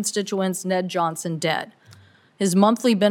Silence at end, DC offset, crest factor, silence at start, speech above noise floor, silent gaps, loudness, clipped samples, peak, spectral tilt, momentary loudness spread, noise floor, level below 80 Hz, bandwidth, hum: 0 s; under 0.1%; 20 dB; 0 s; 30 dB; none; -22 LUFS; under 0.1%; -4 dBFS; -4.5 dB/octave; 8 LU; -51 dBFS; -74 dBFS; 17.5 kHz; none